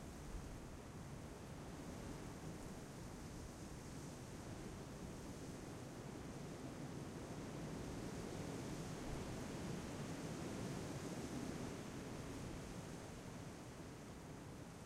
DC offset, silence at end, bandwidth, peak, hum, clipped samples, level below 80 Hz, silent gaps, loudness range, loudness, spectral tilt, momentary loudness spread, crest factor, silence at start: under 0.1%; 0 s; 16 kHz; -34 dBFS; none; under 0.1%; -60 dBFS; none; 4 LU; -51 LUFS; -5.5 dB/octave; 6 LU; 16 dB; 0 s